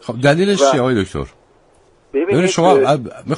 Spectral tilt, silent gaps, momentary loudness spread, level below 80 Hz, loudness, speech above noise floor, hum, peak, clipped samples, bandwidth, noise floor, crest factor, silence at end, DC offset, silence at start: -5.5 dB/octave; none; 12 LU; -44 dBFS; -15 LUFS; 37 dB; none; 0 dBFS; under 0.1%; 11 kHz; -52 dBFS; 16 dB; 0 s; under 0.1%; 0.05 s